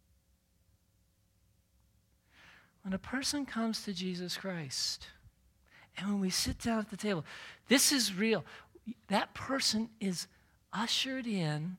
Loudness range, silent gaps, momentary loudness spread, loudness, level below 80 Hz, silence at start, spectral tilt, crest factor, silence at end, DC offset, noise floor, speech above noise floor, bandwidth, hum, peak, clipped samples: 8 LU; none; 17 LU; -33 LUFS; -60 dBFS; 2.45 s; -3 dB/octave; 22 dB; 0 s; under 0.1%; -72 dBFS; 38 dB; 16.5 kHz; none; -14 dBFS; under 0.1%